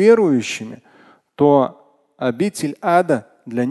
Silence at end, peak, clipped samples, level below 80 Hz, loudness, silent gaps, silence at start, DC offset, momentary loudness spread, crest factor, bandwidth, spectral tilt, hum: 0 s; 0 dBFS; under 0.1%; -64 dBFS; -18 LUFS; none; 0 s; under 0.1%; 12 LU; 16 dB; 12.5 kHz; -6 dB/octave; none